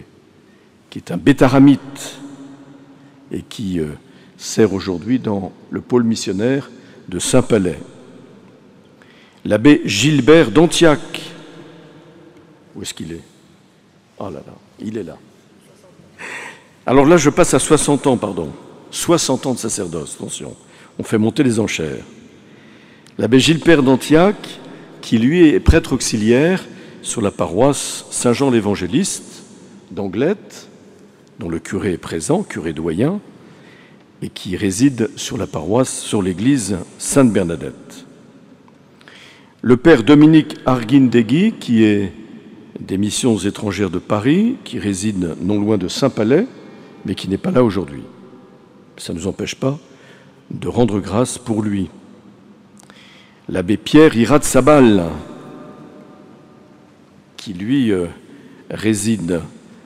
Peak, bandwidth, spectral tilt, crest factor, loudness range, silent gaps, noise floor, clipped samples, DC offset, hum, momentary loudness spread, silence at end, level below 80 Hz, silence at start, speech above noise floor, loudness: -2 dBFS; 15.5 kHz; -5.5 dB/octave; 16 dB; 9 LU; none; -51 dBFS; under 0.1%; under 0.1%; none; 20 LU; 0.35 s; -38 dBFS; 0 s; 36 dB; -16 LUFS